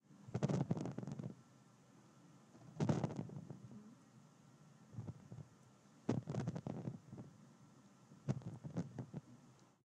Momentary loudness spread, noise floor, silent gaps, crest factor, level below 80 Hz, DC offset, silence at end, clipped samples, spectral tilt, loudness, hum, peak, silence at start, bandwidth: 25 LU; -66 dBFS; none; 24 dB; -78 dBFS; under 0.1%; 0.25 s; under 0.1%; -8 dB/octave; -46 LUFS; none; -22 dBFS; 0.1 s; 10 kHz